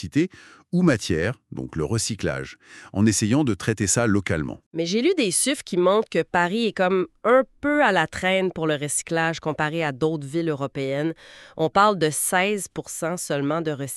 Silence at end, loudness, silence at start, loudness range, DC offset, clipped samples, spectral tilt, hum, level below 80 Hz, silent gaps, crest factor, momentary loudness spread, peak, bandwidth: 0 s; -23 LUFS; 0 s; 3 LU; under 0.1%; under 0.1%; -4.5 dB/octave; none; -52 dBFS; 4.66-4.71 s; 18 dB; 9 LU; -4 dBFS; 13.5 kHz